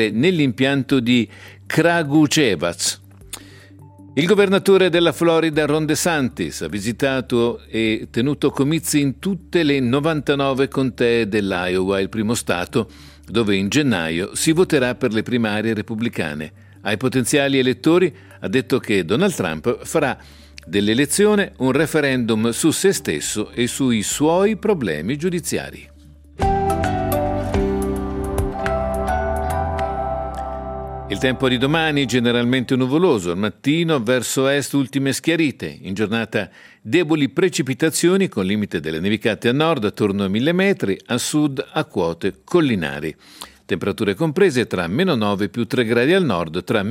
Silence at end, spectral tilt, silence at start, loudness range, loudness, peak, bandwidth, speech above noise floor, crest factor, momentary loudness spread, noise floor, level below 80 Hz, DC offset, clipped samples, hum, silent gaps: 0 s; -5 dB/octave; 0 s; 4 LU; -19 LUFS; -2 dBFS; 16 kHz; 26 dB; 16 dB; 8 LU; -45 dBFS; -40 dBFS; under 0.1%; under 0.1%; none; none